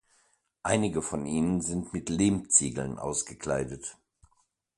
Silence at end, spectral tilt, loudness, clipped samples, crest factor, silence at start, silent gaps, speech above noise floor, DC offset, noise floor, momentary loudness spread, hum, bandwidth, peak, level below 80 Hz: 0.85 s; -4.5 dB/octave; -28 LUFS; under 0.1%; 24 dB; 0.65 s; none; 43 dB; under 0.1%; -72 dBFS; 12 LU; none; 11.5 kHz; -8 dBFS; -52 dBFS